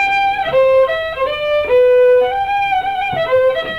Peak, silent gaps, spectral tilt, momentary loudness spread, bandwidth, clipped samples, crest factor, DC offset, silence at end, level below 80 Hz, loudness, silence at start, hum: -4 dBFS; none; -4.5 dB/octave; 8 LU; 6.8 kHz; under 0.1%; 8 dB; 0.4%; 0 s; -44 dBFS; -14 LUFS; 0 s; none